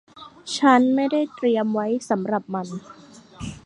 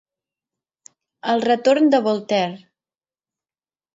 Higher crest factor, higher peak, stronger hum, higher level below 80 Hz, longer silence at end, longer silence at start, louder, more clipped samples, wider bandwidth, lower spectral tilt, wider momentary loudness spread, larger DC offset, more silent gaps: about the same, 20 dB vs 18 dB; about the same, -4 dBFS vs -6 dBFS; neither; first, -56 dBFS vs -74 dBFS; second, 0.1 s vs 1.4 s; second, 0.15 s vs 1.25 s; about the same, -21 LUFS vs -19 LUFS; neither; first, 11 kHz vs 7.8 kHz; about the same, -5 dB/octave vs -5.5 dB/octave; first, 20 LU vs 9 LU; neither; neither